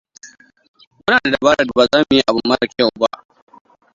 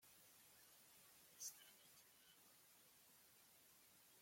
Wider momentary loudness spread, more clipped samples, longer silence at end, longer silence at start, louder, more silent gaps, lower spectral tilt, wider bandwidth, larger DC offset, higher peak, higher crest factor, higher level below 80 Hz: second, 8 LU vs 13 LU; neither; first, 0.85 s vs 0 s; first, 0.25 s vs 0 s; first, -15 LUFS vs -63 LUFS; first, 0.68-0.74 s, 0.87-0.91 s vs none; first, -4 dB/octave vs 0.5 dB/octave; second, 7.6 kHz vs 16.5 kHz; neither; first, 0 dBFS vs -40 dBFS; second, 18 dB vs 26 dB; first, -50 dBFS vs under -90 dBFS